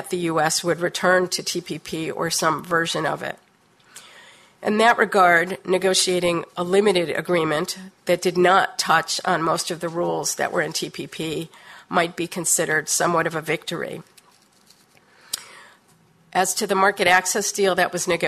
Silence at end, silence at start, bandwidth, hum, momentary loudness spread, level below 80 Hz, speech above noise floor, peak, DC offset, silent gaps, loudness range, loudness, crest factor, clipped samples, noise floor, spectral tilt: 0 s; 0 s; 14 kHz; none; 13 LU; -62 dBFS; 36 dB; -4 dBFS; under 0.1%; none; 6 LU; -21 LUFS; 18 dB; under 0.1%; -57 dBFS; -3 dB/octave